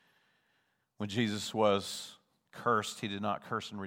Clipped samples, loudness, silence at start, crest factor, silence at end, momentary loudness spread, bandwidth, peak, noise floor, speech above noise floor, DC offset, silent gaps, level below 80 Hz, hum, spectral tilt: under 0.1%; -34 LUFS; 1 s; 22 dB; 0 s; 13 LU; 16.5 kHz; -14 dBFS; -77 dBFS; 43 dB; under 0.1%; none; -82 dBFS; none; -4.5 dB/octave